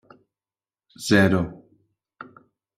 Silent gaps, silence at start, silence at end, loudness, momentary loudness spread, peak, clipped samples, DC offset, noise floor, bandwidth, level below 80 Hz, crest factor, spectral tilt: none; 1 s; 1.2 s; -21 LUFS; 26 LU; -4 dBFS; under 0.1%; under 0.1%; under -90 dBFS; 16 kHz; -56 dBFS; 22 dB; -5.5 dB/octave